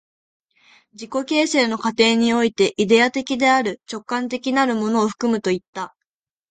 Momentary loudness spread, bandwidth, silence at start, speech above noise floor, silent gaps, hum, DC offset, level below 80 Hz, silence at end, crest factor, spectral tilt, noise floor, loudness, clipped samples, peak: 12 LU; 9.4 kHz; 1 s; 64 dB; 5.68-5.73 s; none; under 0.1%; -62 dBFS; 0.65 s; 18 dB; -4 dB/octave; -83 dBFS; -19 LUFS; under 0.1%; -2 dBFS